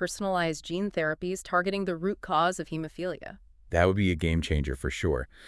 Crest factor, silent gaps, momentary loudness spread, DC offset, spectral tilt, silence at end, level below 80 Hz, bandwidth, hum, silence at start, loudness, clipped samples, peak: 20 dB; none; 9 LU; under 0.1%; -5.5 dB/octave; 0 s; -42 dBFS; 12 kHz; none; 0 s; -29 LUFS; under 0.1%; -8 dBFS